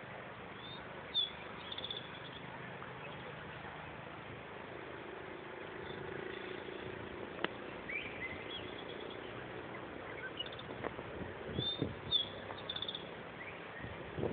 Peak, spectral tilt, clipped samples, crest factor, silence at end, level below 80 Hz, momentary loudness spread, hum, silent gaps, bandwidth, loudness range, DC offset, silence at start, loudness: -18 dBFS; -2 dB/octave; under 0.1%; 26 dB; 0 s; -64 dBFS; 10 LU; none; none; 4.6 kHz; 7 LU; under 0.1%; 0 s; -43 LUFS